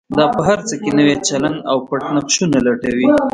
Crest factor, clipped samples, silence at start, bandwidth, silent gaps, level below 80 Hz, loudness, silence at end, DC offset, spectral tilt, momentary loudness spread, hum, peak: 16 dB; under 0.1%; 0.1 s; 10.5 kHz; none; -48 dBFS; -16 LUFS; 0.05 s; under 0.1%; -4.5 dB/octave; 5 LU; none; 0 dBFS